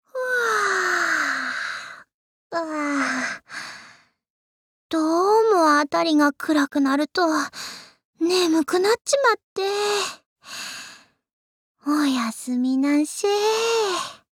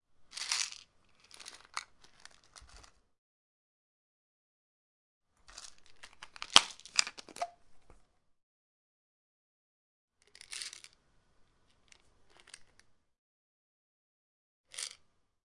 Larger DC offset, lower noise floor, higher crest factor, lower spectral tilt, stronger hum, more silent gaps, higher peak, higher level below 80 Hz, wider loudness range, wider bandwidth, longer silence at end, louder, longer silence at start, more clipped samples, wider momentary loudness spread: neither; second, -51 dBFS vs -69 dBFS; second, 16 dB vs 42 dB; first, -2 dB/octave vs 1.5 dB/octave; neither; second, 2.14-2.50 s, 4.30-4.90 s, 8.05-8.13 s, 9.43-9.56 s, 10.26-10.36 s, 11.33-11.75 s vs 3.18-5.21 s, 8.43-10.08 s, 13.18-14.64 s; second, -6 dBFS vs 0 dBFS; about the same, -76 dBFS vs -72 dBFS; second, 6 LU vs 20 LU; first, 17 kHz vs 12 kHz; second, 0.15 s vs 0.55 s; first, -21 LUFS vs -33 LUFS; about the same, 0.15 s vs 0.2 s; neither; second, 15 LU vs 31 LU